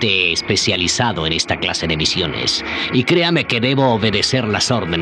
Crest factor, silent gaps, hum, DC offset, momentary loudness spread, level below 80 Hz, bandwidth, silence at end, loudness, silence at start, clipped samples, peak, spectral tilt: 14 dB; none; none; under 0.1%; 4 LU; -44 dBFS; 12 kHz; 0 s; -16 LUFS; 0 s; under 0.1%; -2 dBFS; -3.5 dB/octave